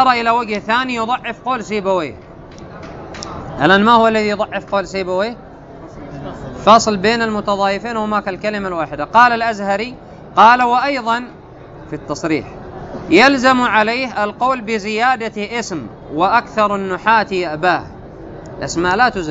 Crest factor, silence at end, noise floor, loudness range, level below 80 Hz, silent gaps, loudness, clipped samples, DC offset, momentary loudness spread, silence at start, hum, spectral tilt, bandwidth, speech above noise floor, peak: 16 dB; 0 s; -36 dBFS; 3 LU; -44 dBFS; none; -15 LUFS; under 0.1%; under 0.1%; 21 LU; 0 s; none; -4.5 dB/octave; 8 kHz; 21 dB; 0 dBFS